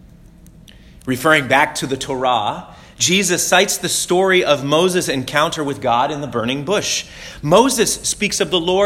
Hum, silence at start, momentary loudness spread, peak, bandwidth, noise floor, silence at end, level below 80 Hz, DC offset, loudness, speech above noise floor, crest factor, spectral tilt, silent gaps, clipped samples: none; 1.05 s; 9 LU; 0 dBFS; 17 kHz; -43 dBFS; 0 s; -46 dBFS; under 0.1%; -16 LUFS; 26 dB; 18 dB; -3 dB/octave; none; under 0.1%